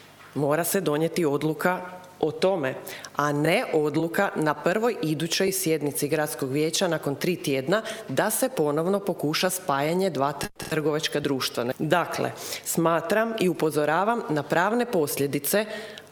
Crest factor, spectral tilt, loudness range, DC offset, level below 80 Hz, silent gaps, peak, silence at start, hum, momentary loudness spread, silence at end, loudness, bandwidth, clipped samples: 18 dB; -4.5 dB/octave; 1 LU; under 0.1%; -64 dBFS; none; -8 dBFS; 0 s; none; 6 LU; 0.05 s; -25 LUFS; over 20 kHz; under 0.1%